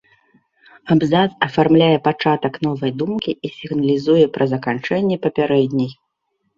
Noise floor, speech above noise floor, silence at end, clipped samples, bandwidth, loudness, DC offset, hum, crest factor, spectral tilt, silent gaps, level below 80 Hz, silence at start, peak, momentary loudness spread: -71 dBFS; 54 dB; 0.65 s; under 0.1%; 7.2 kHz; -18 LUFS; under 0.1%; none; 16 dB; -8 dB/octave; none; -56 dBFS; 0.85 s; -2 dBFS; 9 LU